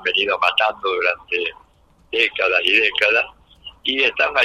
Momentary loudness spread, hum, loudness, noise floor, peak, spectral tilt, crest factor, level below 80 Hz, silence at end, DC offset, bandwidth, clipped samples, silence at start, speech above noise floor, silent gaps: 10 LU; none; -18 LUFS; -39 dBFS; -2 dBFS; -2 dB/octave; 18 dB; -56 dBFS; 0 s; under 0.1%; 15.5 kHz; under 0.1%; 0 s; 20 dB; none